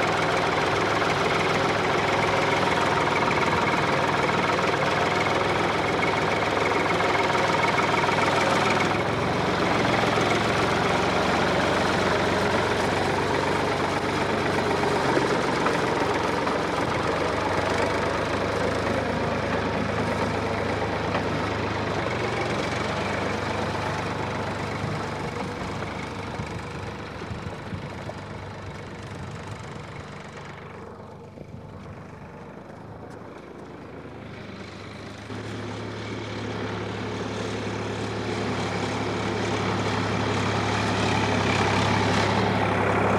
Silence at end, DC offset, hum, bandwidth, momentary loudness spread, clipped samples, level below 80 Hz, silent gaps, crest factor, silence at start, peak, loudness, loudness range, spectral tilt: 0 s; under 0.1%; none; 15 kHz; 16 LU; under 0.1%; -46 dBFS; none; 16 dB; 0 s; -10 dBFS; -24 LUFS; 16 LU; -5 dB/octave